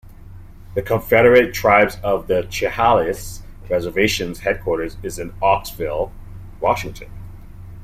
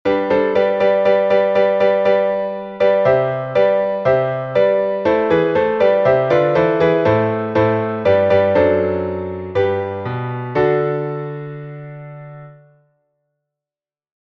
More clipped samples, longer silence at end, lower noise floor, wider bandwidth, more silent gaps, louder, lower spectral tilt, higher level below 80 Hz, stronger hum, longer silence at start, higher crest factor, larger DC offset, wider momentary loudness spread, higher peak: neither; second, 0 s vs 1.75 s; second, -38 dBFS vs under -90 dBFS; first, 16 kHz vs 6.2 kHz; neither; about the same, -18 LUFS vs -16 LUFS; second, -5 dB/octave vs -8 dB/octave; first, -38 dBFS vs -50 dBFS; neither; about the same, 0.05 s vs 0.05 s; about the same, 18 dB vs 14 dB; neither; first, 19 LU vs 11 LU; about the same, -2 dBFS vs -2 dBFS